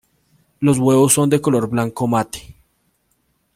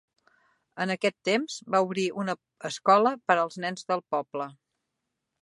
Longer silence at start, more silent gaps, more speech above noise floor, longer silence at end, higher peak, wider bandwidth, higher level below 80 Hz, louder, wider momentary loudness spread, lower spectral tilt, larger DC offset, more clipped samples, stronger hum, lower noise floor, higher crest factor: second, 0.6 s vs 0.75 s; neither; second, 49 dB vs 56 dB; first, 1.05 s vs 0.9 s; first, -2 dBFS vs -6 dBFS; first, 16.5 kHz vs 11.5 kHz; first, -52 dBFS vs -80 dBFS; first, -16 LUFS vs -27 LUFS; second, 8 LU vs 14 LU; about the same, -5.5 dB/octave vs -4.5 dB/octave; neither; neither; neither; second, -65 dBFS vs -83 dBFS; second, 16 dB vs 22 dB